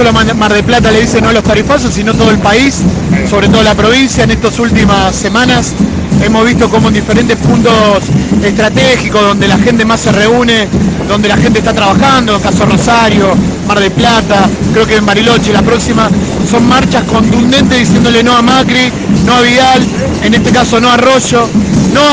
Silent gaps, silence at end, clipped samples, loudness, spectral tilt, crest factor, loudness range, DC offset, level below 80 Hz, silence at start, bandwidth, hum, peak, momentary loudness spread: none; 0 s; 0.3%; -7 LUFS; -5 dB/octave; 6 dB; 1 LU; 0.3%; -24 dBFS; 0 s; 10 kHz; none; 0 dBFS; 4 LU